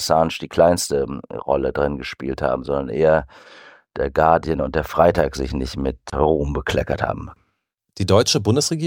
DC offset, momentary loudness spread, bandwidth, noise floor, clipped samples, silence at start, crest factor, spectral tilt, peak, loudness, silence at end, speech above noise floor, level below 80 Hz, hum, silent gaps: under 0.1%; 11 LU; 17 kHz; -73 dBFS; under 0.1%; 0 s; 18 dB; -5 dB/octave; -2 dBFS; -20 LUFS; 0 s; 53 dB; -36 dBFS; none; none